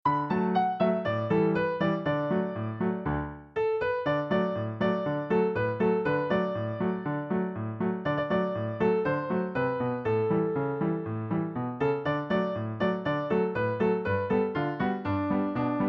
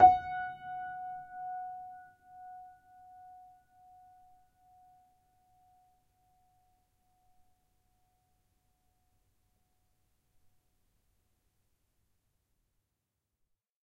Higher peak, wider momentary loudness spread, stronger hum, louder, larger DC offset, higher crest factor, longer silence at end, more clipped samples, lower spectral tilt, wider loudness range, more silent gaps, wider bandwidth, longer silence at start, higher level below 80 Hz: second, -14 dBFS vs -10 dBFS; second, 5 LU vs 19 LU; neither; first, -29 LUFS vs -35 LUFS; neither; second, 14 dB vs 28 dB; second, 0 s vs 11.2 s; neither; first, -9.5 dB/octave vs -6.5 dB/octave; second, 1 LU vs 21 LU; neither; first, 5.8 kHz vs 4.8 kHz; about the same, 0.05 s vs 0 s; first, -56 dBFS vs -68 dBFS